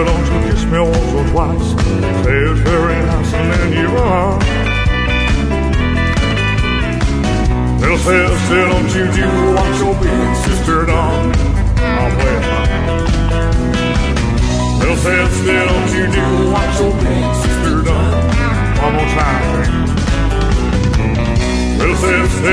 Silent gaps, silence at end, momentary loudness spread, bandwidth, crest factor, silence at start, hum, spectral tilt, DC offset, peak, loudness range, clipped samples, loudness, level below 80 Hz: none; 0 s; 3 LU; 11 kHz; 12 dB; 0 s; none; -6 dB/octave; under 0.1%; 0 dBFS; 1 LU; under 0.1%; -14 LUFS; -18 dBFS